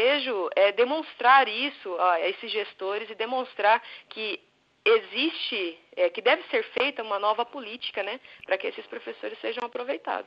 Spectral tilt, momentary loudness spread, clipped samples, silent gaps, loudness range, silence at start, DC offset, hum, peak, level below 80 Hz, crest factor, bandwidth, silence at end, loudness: -4 dB/octave; 12 LU; under 0.1%; none; 5 LU; 0 s; under 0.1%; none; -8 dBFS; -82 dBFS; 18 dB; 5.6 kHz; 0.05 s; -26 LUFS